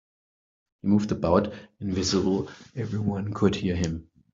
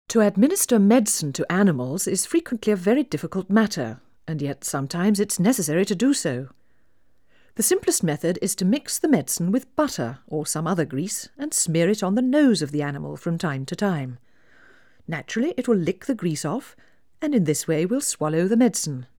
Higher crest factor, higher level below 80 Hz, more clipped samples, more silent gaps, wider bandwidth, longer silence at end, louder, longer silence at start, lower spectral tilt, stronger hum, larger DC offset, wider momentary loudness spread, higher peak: about the same, 20 dB vs 18 dB; first, -52 dBFS vs -64 dBFS; neither; neither; second, 7.8 kHz vs over 20 kHz; first, 0.3 s vs 0.15 s; second, -26 LUFS vs -23 LUFS; first, 0.85 s vs 0.1 s; about the same, -6 dB/octave vs -5 dB/octave; neither; second, under 0.1% vs 0.2%; about the same, 11 LU vs 11 LU; second, -8 dBFS vs -4 dBFS